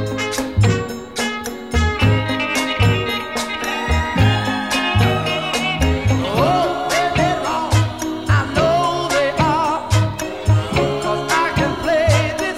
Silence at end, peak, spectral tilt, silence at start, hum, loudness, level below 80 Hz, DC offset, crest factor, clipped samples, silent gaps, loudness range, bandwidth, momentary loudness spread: 0 s; -2 dBFS; -5 dB/octave; 0 s; none; -18 LUFS; -30 dBFS; 0.3%; 14 dB; under 0.1%; none; 1 LU; 15 kHz; 6 LU